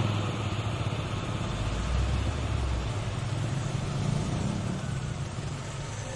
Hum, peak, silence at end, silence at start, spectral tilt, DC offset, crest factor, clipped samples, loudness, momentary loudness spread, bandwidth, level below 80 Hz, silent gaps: none; -16 dBFS; 0 s; 0 s; -5.5 dB/octave; under 0.1%; 14 dB; under 0.1%; -32 LUFS; 5 LU; 11.5 kHz; -38 dBFS; none